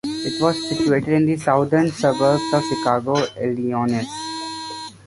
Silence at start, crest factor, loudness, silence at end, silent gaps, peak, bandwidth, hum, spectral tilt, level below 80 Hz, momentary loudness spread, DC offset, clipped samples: 0.05 s; 16 dB; -20 LUFS; 0.1 s; none; -4 dBFS; 11.5 kHz; none; -5.5 dB/octave; -54 dBFS; 10 LU; under 0.1%; under 0.1%